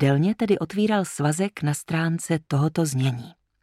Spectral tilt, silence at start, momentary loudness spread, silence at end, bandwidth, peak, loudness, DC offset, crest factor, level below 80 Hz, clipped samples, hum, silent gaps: -6 dB/octave; 0 s; 4 LU; 0.3 s; 14.5 kHz; -8 dBFS; -24 LUFS; under 0.1%; 14 dB; -62 dBFS; under 0.1%; none; none